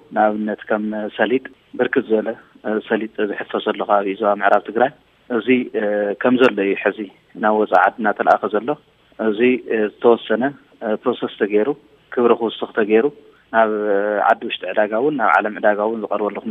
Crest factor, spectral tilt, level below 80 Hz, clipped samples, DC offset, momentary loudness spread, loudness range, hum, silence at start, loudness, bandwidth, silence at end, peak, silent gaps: 18 dB; -7.5 dB/octave; -68 dBFS; under 0.1%; under 0.1%; 9 LU; 3 LU; none; 0.1 s; -19 LUFS; 6.6 kHz; 0 s; 0 dBFS; none